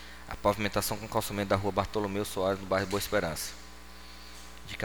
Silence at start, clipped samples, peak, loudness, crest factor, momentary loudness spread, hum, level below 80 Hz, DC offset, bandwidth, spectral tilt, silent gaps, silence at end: 0 s; under 0.1%; -10 dBFS; -31 LUFS; 22 dB; 18 LU; none; -50 dBFS; 0.4%; over 20 kHz; -4.5 dB/octave; none; 0 s